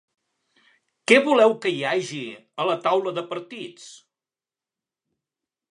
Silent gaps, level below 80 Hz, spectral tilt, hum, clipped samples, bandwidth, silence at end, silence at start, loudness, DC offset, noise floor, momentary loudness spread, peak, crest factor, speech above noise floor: none; -76 dBFS; -4 dB/octave; none; under 0.1%; 11 kHz; 1.75 s; 1.1 s; -21 LUFS; under 0.1%; under -90 dBFS; 18 LU; 0 dBFS; 24 dB; over 68 dB